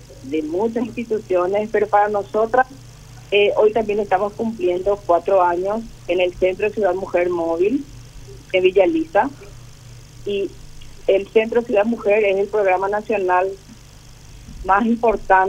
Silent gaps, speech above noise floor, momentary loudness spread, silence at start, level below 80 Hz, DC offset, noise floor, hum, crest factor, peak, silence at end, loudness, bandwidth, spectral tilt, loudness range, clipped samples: none; 24 dB; 9 LU; 0 s; -44 dBFS; under 0.1%; -42 dBFS; 50 Hz at -45 dBFS; 18 dB; -2 dBFS; 0 s; -19 LUFS; 12 kHz; -5.5 dB/octave; 2 LU; under 0.1%